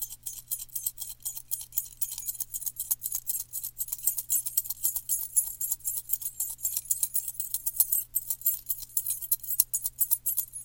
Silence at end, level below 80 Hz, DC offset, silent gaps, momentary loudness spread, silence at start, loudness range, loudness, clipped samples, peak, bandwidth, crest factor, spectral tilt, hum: 0 s; -60 dBFS; under 0.1%; none; 8 LU; 0 s; 5 LU; -28 LUFS; under 0.1%; -2 dBFS; 17.5 kHz; 30 dB; 1.5 dB/octave; none